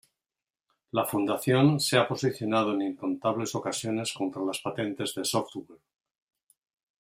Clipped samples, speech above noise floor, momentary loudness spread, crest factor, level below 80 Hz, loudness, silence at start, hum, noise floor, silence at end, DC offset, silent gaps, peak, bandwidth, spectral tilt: under 0.1%; over 62 dB; 9 LU; 24 dB; -70 dBFS; -28 LUFS; 0.95 s; none; under -90 dBFS; 1.25 s; under 0.1%; none; -6 dBFS; 16 kHz; -5 dB/octave